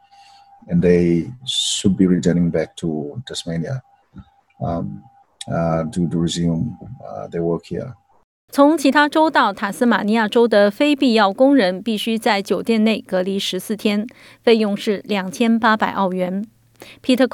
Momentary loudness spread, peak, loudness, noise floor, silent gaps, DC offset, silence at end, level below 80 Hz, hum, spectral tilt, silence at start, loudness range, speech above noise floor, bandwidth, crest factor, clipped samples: 13 LU; -2 dBFS; -18 LUFS; -48 dBFS; 8.24-8.48 s; under 0.1%; 0.05 s; -52 dBFS; none; -5.5 dB/octave; 0.65 s; 8 LU; 30 dB; 16.5 kHz; 16 dB; under 0.1%